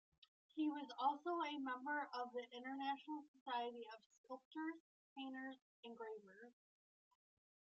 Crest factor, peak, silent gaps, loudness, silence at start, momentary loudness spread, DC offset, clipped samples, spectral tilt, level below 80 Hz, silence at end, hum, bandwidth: 22 dB; -28 dBFS; 3.28-3.34 s, 3.41-3.46 s, 4.06-4.10 s, 4.18-4.24 s, 4.45-4.51 s, 4.80-5.16 s, 5.61-5.83 s; -48 LUFS; 0.55 s; 17 LU; under 0.1%; under 0.1%; 0 dB/octave; under -90 dBFS; 1.1 s; none; 7.4 kHz